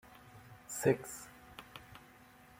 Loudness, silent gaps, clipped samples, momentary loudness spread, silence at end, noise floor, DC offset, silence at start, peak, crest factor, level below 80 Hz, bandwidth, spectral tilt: -36 LUFS; none; under 0.1%; 24 LU; 0.35 s; -60 dBFS; under 0.1%; 0.05 s; -16 dBFS; 24 dB; -68 dBFS; 16.5 kHz; -5 dB/octave